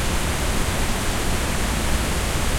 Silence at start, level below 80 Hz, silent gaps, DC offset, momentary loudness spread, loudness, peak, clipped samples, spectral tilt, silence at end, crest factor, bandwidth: 0 s; -26 dBFS; none; under 0.1%; 1 LU; -23 LUFS; -8 dBFS; under 0.1%; -3.5 dB/octave; 0 s; 14 dB; 16.5 kHz